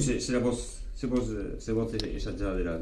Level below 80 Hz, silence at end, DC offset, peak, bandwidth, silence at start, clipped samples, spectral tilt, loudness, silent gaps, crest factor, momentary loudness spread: -38 dBFS; 0 s; under 0.1%; -14 dBFS; 12 kHz; 0 s; under 0.1%; -5.5 dB/octave; -32 LUFS; none; 16 dB; 8 LU